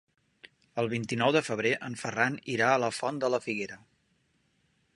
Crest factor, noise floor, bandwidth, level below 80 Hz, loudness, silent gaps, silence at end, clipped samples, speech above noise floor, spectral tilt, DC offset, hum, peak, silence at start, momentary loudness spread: 22 dB; -72 dBFS; 11.5 kHz; -72 dBFS; -29 LUFS; none; 1.2 s; under 0.1%; 43 dB; -4.5 dB/octave; under 0.1%; none; -10 dBFS; 0.45 s; 9 LU